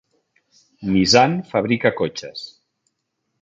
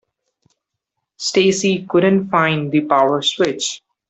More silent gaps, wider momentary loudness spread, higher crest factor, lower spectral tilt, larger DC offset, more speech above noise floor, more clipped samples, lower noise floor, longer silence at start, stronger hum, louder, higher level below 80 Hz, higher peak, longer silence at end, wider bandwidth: neither; first, 19 LU vs 5 LU; about the same, 20 dB vs 16 dB; about the same, -4.5 dB/octave vs -4.5 dB/octave; neither; second, 56 dB vs 62 dB; neither; about the same, -75 dBFS vs -78 dBFS; second, 0.8 s vs 1.2 s; neither; about the same, -18 LUFS vs -16 LUFS; first, -52 dBFS vs -60 dBFS; about the same, -2 dBFS vs -2 dBFS; first, 0.95 s vs 0.3 s; about the same, 9.2 kHz vs 8.4 kHz